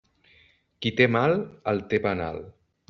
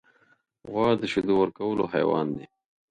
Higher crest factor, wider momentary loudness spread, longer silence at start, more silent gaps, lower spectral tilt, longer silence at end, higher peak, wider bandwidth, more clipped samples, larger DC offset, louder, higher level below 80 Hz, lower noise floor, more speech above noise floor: about the same, 22 dB vs 18 dB; about the same, 11 LU vs 9 LU; first, 0.8 s vs 0.65 s; neither; second, -4.5 dB/octave vs -7 dB/octave; about the same, 0.4 s vs 0.45 s; first, -6 dBFS vs -10 dBFS; second, 7 kHz vs 9.4 kHz; neither; neither; about the same, -25 LUFS vs -26 LUFS; about the same, -60 dBFS vs -60 dBFS; second, -61 dBFS vs -65 dBFS; second, 36 dB vs 40 dB